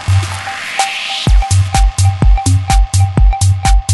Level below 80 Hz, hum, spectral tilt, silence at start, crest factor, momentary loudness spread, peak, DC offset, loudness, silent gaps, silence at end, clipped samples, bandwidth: -14 dBFS; none; -4 dB/octave; 0 s; 10 dB; 4 LU; 0 dBFS; under 0.1%; -13 LUFS; none; 0 s; under 0.1%; 12 kHz